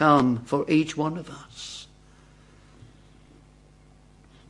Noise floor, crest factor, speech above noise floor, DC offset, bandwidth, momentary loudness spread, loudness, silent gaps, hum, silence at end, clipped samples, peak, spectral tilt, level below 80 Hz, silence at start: -54 dBFS; 22 dB; 31 dB; under 0.1%; 11 kHz; 21 LU; -25 LUFS; none; none; 2.65 s; under 0.1%; -4 dBFS; -6 dB/octave; -58 dBFS; 0 s